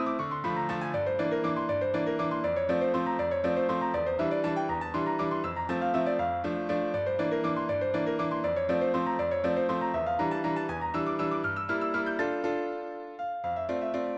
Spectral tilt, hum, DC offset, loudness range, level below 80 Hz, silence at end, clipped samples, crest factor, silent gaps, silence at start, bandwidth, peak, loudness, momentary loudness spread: -7.5 dB/octave; none; under 0.1%; 2 LU; -60 dBFS; 0 s; under 0.1%; 14 dB; none; 0 s; 7.8 kHz; -16 dBFS; -29 LUFS; 4 LU